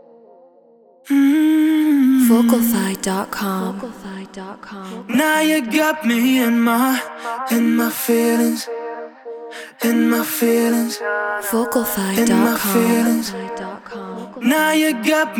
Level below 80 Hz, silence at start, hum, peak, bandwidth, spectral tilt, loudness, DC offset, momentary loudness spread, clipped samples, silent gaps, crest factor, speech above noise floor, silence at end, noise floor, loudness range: -58 dBFS; 1.05 s; none; -2 dBFS; 19.5 kHz; -4 dB/octave; -17 LUFS; under 0.1%; 18 LU; under 0.1%; none; 16 dB; 33 dB; 0 s; -50 dBFS; 4 LU